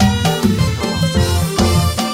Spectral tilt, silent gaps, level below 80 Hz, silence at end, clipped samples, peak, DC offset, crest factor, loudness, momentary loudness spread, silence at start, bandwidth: -5 dB/octave; none; -26 dBFS; 0 s; under 0.1%; -2 dBFS; under 0.1%; 14 dB; -15 LUFS; 3 LU; 0 s; 16.5 kHz